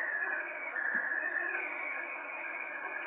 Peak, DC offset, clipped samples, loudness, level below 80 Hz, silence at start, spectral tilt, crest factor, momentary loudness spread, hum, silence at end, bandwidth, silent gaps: -22 dBFS; under 0.1%; under 0.1%; -35 LUFS; under -90 dBFS; 0 s; 6.5 dB/octave; 14 dB; 6 LU; none; 0 s; 3.9 kHz; none